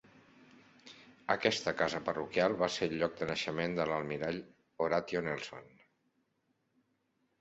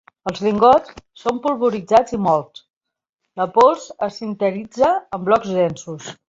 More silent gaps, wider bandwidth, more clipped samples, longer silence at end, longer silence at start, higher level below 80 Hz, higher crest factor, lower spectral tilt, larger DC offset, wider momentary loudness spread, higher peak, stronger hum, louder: second, none vs 2.70-2.81 s, 3.09-3.13 s; about the same, 8 kHz vs 7.8 kHz; neither; first, 1.7 s vs 0.15 s; first, 0.85 s vs 0.25 s; second, -68 dBFS vs -54 dBFS; first, 26 dB vs 18 dB; second, -3 dB/octave vs -6 dB/octave; neither; first, 15 LU vs 12 LU; second, -12 dBFS vs -2 dBFS; neither; second, -34 LUFS vs -18 LUFS